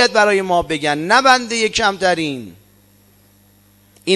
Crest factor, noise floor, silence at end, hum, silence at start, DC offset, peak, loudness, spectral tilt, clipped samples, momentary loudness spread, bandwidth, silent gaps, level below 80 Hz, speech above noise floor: 18 dB; -52 dBFS; 0 s; 50 Hz at -50 dBFS; 0 s; under 0.1%; 0 dBFS; -15 LUFS; -3 dB/octave; under 0.1%; 11 LU; 14 kHz; none; -50 dBFS; 36 dB